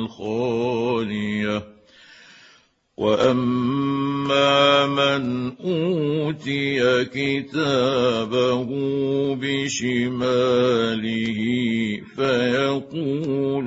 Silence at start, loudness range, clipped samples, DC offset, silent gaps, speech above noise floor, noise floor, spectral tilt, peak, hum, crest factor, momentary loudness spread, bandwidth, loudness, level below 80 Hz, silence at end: 0 s; 4 LU; under 0.1%; under 0.1%; none; 35 dB; -57 dBFS; -5.5 dB/octave; -4 dBFS; none; 18 dB; 7 LU; 8 kHz; -21 LUFS; -58 dBFS; 0 s